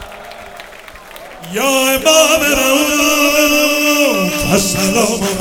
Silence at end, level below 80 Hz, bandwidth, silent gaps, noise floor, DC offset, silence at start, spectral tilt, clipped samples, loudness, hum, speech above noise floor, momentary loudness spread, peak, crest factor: 0 s; -38 dBFS; 18.5 kHz; none; -35 dBFS; under 0.1%; 0 s; -2.5 dB/octave; under 0.1%; -11 LUFS; none; 22 dB; 22 LU; 0 dBFS; 14 dB